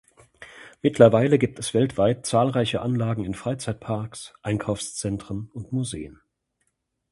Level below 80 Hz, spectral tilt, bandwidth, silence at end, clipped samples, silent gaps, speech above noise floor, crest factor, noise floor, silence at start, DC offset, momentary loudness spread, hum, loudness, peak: -52 dBFS; -6 dB/octave; 11.5 kHz; 1 s; under 0.1%; none; 51 dB; 24 dB; -75 dBFS; 0.4 s; under 0.1%; 17 LU; none; -24 LUFS; 0 dBFS